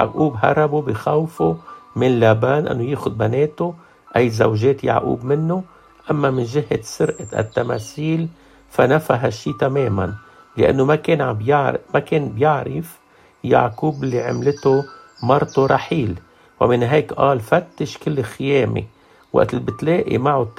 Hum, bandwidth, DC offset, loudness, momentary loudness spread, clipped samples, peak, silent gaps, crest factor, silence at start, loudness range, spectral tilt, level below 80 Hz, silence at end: none; 15 kHz; under 0.1%; -19 LUFS; 10 LU; under 0.1%; 0 dBFS; none; 18 dB; 0 s; 2 LU; -7 dB/octave; -50 dBFS; 0.1 s